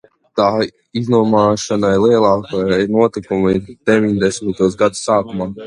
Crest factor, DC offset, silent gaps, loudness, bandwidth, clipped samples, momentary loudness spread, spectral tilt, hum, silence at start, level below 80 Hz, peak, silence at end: 14 dB; under 0.1%; none; -15 LUFS; 11 kHz; under 0.1%; 6 LU; -6 dB/octave; none; 0.35 s; -46 dBFS; 0 dBFS; 0 s